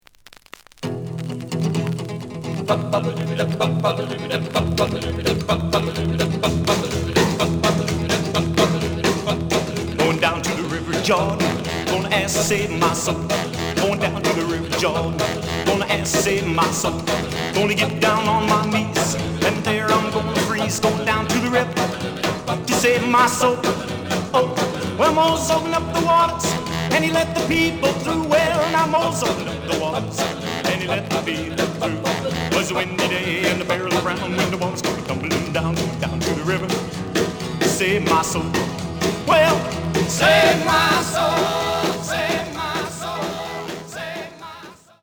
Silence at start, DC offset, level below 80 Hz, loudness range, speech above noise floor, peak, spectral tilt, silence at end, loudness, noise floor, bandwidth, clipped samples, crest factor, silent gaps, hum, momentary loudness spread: 0.8 s; under 0.1%; -42 dBFS; 4 LU; 28 dB; -4 dBFS; -4.5 dB/octave; 0.3 s; -20 LUFS; -48 dBFS; over 20 kHz; under 0.1%; 16 dB; none; none; 8 LU